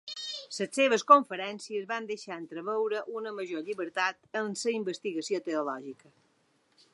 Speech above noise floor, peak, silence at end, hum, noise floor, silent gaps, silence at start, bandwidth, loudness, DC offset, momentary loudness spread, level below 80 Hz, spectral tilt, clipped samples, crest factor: 40 dB; -6 dBFS; 1 s; none; -70 dBFS; none; 0.05 s; 11.5 kHz; -30 LUFS; under 0.1%; 16 LU; -88 dBFS; -3 dB/octave; under 0.1%; 26 dB